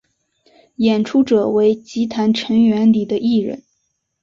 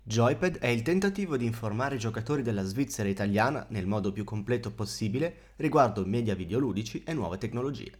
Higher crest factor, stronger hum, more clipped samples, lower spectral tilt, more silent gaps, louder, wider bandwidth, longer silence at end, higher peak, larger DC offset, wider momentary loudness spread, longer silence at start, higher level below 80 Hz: second, 14 dB vs 20 dB; neither; neither; about the same, -6.5 dB/octave vs -6 dB/octave; neither; first, -16 LUFS vs -30 LUFS; second, 7.2 kHz vs 17 kHz; first, 0.65 s vs 0.1 s; first, -4 dBFS vs -10 dBFS; neither; about the same, 8 LU vs 7 LU; first, 0.8 s vs 0.05 s; about the same, -58 dBFS vs -54 dBFS